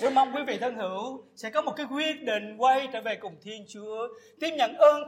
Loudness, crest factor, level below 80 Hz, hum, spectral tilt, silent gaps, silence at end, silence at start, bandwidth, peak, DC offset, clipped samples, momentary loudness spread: -28 LUFS; 20 dB; -82 dBFS; none; -3.5 dB/octave; none; 0 s; 0 s; 15 kHz; -8 dBFS; under 0.1%; under 0.1%; 15 LU